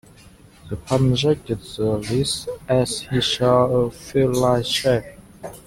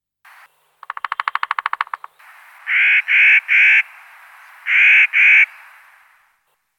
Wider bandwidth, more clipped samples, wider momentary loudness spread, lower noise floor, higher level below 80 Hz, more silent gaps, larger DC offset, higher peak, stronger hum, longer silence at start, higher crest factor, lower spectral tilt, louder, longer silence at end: about the same, 16 kHz vs 15 kHz; neither; second, 10 LU vs 20 LU; second, -48 dBFS vs -65 dBFS; first, -44 dBFS vs -84 dBFS; neither; neither; second, -4 dBFS vs 0 dBFS; neither; second, 0.65 s vs 0.9 s; about the same, 18 dB vs 18 dB; first, -5.5 dB/octave vs 5 dB/octave; second, -20 LUFS vs -12 LUFS; second, 0.05 s vs 1.35 s